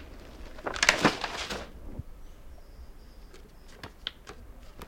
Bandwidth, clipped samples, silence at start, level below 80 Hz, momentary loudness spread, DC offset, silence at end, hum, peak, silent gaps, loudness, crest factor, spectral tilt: 16.5 kHz; under 0.1%; 0 s; -48 dBFS; 28 LU; under 0.1%; 0 s; none; -2 dBFS; none; -29 LUFS; 32 dB; -2.5 dB/octave